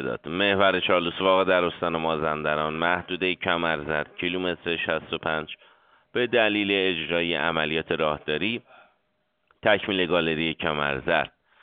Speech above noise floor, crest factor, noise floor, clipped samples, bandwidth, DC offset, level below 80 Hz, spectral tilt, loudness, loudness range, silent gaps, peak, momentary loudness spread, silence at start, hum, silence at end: 49 dB; 22 dB; -73 dBFS; under 0.1%; 4.7 kHz; under 0.1%; -56 dBFS; -2 dB/octave; -24 LUFS; 3 LU; none; -4 dBFS; 7 LU; 0 s; none; 0.35 s